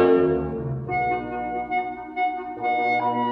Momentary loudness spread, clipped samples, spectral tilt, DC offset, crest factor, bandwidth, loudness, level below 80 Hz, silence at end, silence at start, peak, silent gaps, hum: 8 LU; under 0.1%; -9 dB/octave; under 0.1%; 16 dB; 5.4 kHz; -25 LUFS; -48 dBFS; 0 s; 0 s; -8 dBFS; none; none